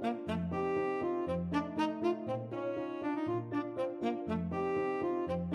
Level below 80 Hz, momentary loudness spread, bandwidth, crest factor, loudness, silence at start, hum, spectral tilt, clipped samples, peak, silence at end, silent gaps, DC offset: -62 dBFS; 4 LU; 10.5 kHz; 14 dB; -36 LUFS; 0 s; none; -8 dB/octave; under 0.1%; -20 dBFS; 0 s; none; under 0.1%